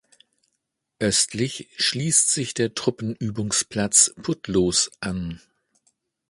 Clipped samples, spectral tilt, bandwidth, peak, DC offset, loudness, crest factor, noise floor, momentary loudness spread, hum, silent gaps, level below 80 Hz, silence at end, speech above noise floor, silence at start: under 0.1%; -2.5 dB/octave; 11.5 kHz; -2 dBFS; under 0.1%; -21 LUFS; 22 dB; -78 dBFS; 12 LU; none; none; -52 dBFS; 0.95 s; 55 dB; 1 s